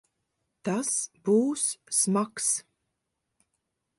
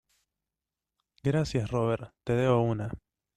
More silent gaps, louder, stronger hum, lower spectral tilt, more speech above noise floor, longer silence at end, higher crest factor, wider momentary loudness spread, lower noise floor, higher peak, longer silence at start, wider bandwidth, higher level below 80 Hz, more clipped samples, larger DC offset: neither; about the same, -27 LUFS vs -29 LUFS; neither; second, -4 dB/octave vs -7.5 dB/octave; second, 55 dB vs 62 dB; first, 1.4 s vs 0.4 s; about the same, 18 dB vs 18 dB; about the same, 7 LU vs 9 LU; second, -82 dBFS vs -90 dBFS; about the same, -12 dBFS vs -12 dBFS; second, 0.65 s vs 1.25 s; first, 12 kHz vs 10.5 kHz; second, -78 dBFS vs -54 dBFS; neither; neither